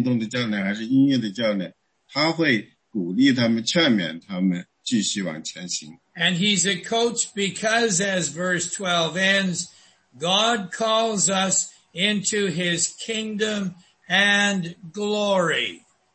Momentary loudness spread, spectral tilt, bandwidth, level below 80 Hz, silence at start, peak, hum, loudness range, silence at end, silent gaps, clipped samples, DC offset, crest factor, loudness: 10 LU; -3 dB/octave; 8.8 kHz; -68 dBFS; 0 s; -6 dBFS; none; 2 LU; 0.35 s; none; under 0.1%; under 0.1%; 18 dB; -22 LUFS